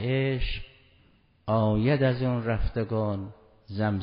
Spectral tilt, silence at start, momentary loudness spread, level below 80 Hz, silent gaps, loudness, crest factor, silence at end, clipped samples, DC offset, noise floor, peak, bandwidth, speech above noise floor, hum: -6.5 dB/octave; 0 s; 15 LU; -38 dBFS; none; -27 LUFS; 16 dB; 0 s; under 0.1%; under 0.1%; -61 dBFS; -10 dBFS; 5.2 kHz; 36 dB; none